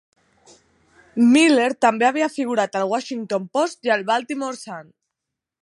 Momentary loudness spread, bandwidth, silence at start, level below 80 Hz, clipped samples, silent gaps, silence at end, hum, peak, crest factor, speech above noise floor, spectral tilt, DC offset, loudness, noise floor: 15 LU; 11.5 kHz; 1.15 s; -74 dBFS; under 0.1%; none; 0.8 s; none; -4 dBFS; 18 dB; 64 dB; -4 dB/octave; under 0.1%; -19 LUFS; -83 dBFS